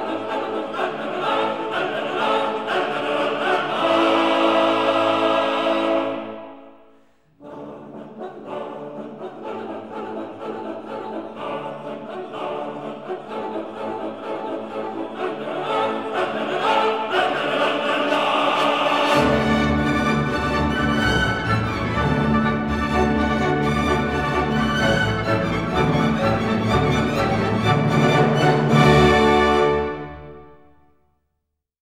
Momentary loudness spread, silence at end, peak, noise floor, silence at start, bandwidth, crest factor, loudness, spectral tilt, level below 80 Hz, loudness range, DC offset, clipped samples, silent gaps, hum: 15 LU; 1.35 s; -2 dBFS; -77 dBFS; 0 s; 15 kHz; 18 dB; -20 LUFS; -6 dB/octave; -38 dBFS; 14 LU; 0.3%; under 0.1%; none; none